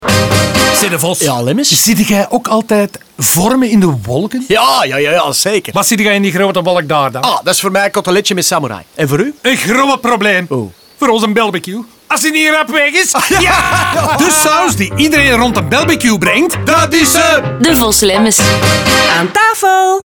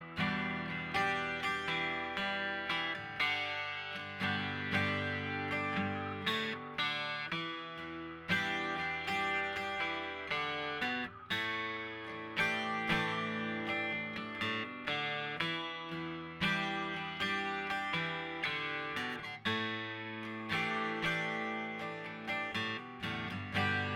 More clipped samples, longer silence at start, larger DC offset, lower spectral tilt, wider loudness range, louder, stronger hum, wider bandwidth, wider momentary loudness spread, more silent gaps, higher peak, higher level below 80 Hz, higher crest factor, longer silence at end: neither; about the same, 0 s vs 0 s; neither; second, -3 dB/octave vs -4.5 dB/octave; about the same, 3 LU vs 2 LU; first, -10 LUFS vs -36 LUFS; neither; first, over 20 kHz vs 17.5 kHz; about the same, 5 LU vs 7 LU; neither; first, 0 dBFS vs -16 dBFS; first, -36 dBFS vs -66 dBFS; second, 10 dB vs 22 dB; about the same, 0.05 s vs 0 s